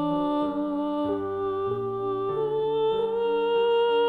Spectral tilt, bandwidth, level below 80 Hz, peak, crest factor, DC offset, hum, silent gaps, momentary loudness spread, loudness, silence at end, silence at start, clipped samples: -8 dB/octave; 4.5 kHz; -58 dBFS; -16 dBFS; 10 dB; under 0.1%; none; none; 6 LU; -26 LUFS; 0 s; 0 s; under 0.1%